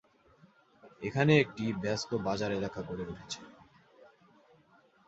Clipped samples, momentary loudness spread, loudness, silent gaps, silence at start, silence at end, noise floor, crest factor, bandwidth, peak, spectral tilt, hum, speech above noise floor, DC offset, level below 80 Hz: under 0.1%; 16 LU; -32 LUFS; none; 0.85 s; 1.55 s; -65 dBFS; 24 dB; 8 kHz; -10 dBFS; -6 dB/octave; none; 33 dB; under 0.1%; -62 dBFS